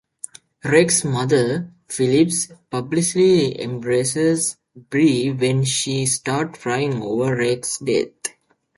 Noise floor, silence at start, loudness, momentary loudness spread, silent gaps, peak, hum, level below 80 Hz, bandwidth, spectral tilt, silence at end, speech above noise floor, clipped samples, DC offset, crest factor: -40 dBFS; 0.65 s; -19 LUFS; 12 LU; none; -2 dBFS; none; -58 dBFS; 11.5 kHz; -4.5 dB/octave; 0.5 s; 21 dB; under 0.1%; under 0.1%; 18 dB